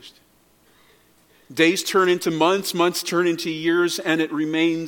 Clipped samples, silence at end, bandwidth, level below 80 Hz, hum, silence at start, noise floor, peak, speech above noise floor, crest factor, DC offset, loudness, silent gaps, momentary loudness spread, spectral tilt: under 0.1%; 0 s; 17.5 kHz; -72 dBFS; none; 0.05 s; -58 dBFS; -4 dBFS; 38 dB; 18 dB; under 0.1%; -20 LUFS; none; 4 LU; -4 dB/octave